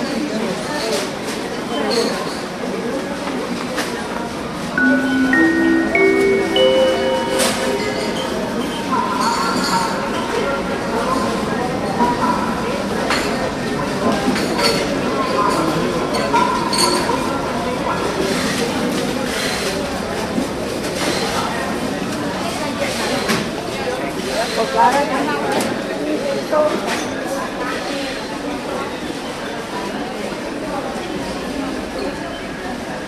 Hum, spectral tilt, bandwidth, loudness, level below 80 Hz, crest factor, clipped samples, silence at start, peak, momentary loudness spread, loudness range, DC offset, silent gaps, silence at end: none; -4 dB/octave; 14 kHz; -19 LUFS; -42 dBFS; 18 dB; under 0.1%; 0 s; -2 dBFS; 9 LU; 8 LU; under 0.1%; none; 0 s